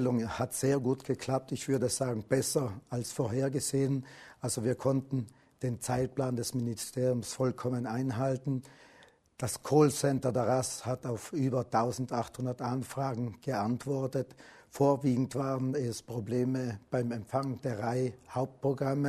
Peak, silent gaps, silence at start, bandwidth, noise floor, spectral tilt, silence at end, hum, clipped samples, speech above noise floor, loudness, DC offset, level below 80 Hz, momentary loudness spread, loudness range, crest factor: -12 dBFS; none; 0 s; 13.5 kHz; -61 dBFS; -6 dB/octave; 0 s; none; under 0.1%; 29 dB; -32 LUFS; under 0.1%; -64 dBFS; 7 LU; 3 LU; 20 dB